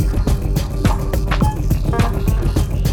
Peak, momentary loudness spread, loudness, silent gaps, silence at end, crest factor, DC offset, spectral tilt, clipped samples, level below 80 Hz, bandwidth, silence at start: -4 dBFS; 2 LU; -19 LUFS; none; 0 s; 12 dB; under 0.1%; -6.5 dB/octave; under 0.1%; -18 dBFS; 18 kHz; 0 s